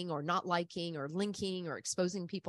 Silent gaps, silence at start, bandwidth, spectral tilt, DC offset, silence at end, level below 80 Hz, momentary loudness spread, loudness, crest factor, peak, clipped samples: none; 0 s; 12 kHz; -4.5 dB/octave; under 0.1%; 0 s; -74 dBFS; 6 LU; -37 LUFS; 20 dB; -18 dBFS; under 0.1%